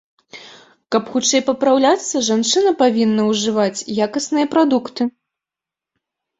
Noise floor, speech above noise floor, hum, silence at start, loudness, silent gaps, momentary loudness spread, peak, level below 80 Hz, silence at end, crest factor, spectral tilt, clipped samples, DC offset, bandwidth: -87 dBFS; 71 dB; none; 0.35 s; -17 LUFS; none; 7 LU; -2 dBFS; -62 dBFS; 1.3 s; 16 dB; -3.5 dB/octave; under 0.1%; under 0.1%; 8.2 kHz